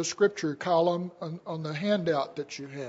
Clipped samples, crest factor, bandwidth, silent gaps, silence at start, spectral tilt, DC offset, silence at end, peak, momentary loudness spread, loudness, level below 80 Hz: under 0.1%; 16 dB; 8 kHz; none; 0 s; -5 dB/octave; under 0.1%; 0 s; -12 dBFS; 12 LU; -29 LUFS; -74 dBFS